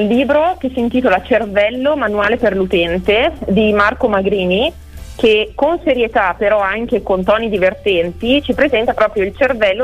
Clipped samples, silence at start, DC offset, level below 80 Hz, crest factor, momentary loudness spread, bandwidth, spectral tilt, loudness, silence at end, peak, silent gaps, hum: under 0.1%; 0 s; under 0.1%; -36 dBFS; 12 dB; 3 LU; 14.5 kHz; -6.5 dB/octave; -14 LUFS; 0 s; -2 dBFS; none; none